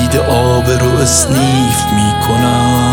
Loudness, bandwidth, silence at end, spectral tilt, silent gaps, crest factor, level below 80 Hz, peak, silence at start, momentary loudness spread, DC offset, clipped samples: -11 LUFS; 19.5 kHz; 0 s; -4.5 dB/octave; none; 10 dB; -26 dBFS; 0 dBFS; 0 s; 2 LU; under 0.1%; under 0.1%